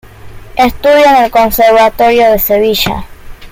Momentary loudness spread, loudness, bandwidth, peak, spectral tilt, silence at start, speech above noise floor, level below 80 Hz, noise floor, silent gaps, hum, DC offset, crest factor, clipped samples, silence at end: 7 LU; -8 LUFS; 17 kHz; 0 dBFS; -4 dB/octave; 0.25 s; 21 dB; -30 dBFS; -29 dBFS; none; none; under 0.1%; 8 dB; under 0.1%; 0.05 s